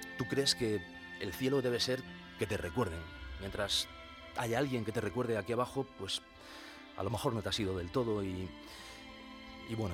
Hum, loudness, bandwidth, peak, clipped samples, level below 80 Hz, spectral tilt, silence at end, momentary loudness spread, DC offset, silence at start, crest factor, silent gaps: none; -36 LUFS; 18 kHz; -16 dBFS; under 0.1%; -56 dBFS; -4.5 dB/octave; 0 s; 16 LU; under 0.1%; 0 s; 22 dB; none